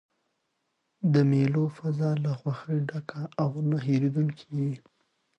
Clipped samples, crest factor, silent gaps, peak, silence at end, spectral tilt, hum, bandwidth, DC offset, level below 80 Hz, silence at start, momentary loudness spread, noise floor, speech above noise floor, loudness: under 0.1%; 16 dB; none; -12 dBFS; 0.6 s; -9 dB/octave; none; 7.6 kHz; under 0.1%; -70 dBFS; 1 s; 10 LU; -78 dBFS; 51 dB; -28 LUFS